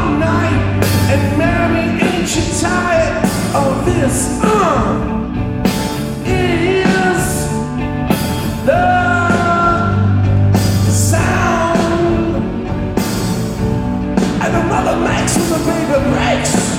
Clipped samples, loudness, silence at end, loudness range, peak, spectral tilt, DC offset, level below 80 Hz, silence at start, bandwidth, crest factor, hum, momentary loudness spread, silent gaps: under 0.1%; -14 LUFS; 0 s; 3 LU; 0 dBFS; -5.5 dB/octave; under 0.1%; -28 dBFS; 0 s; 16.5 kHz; 14 dB; none; 5 LU; none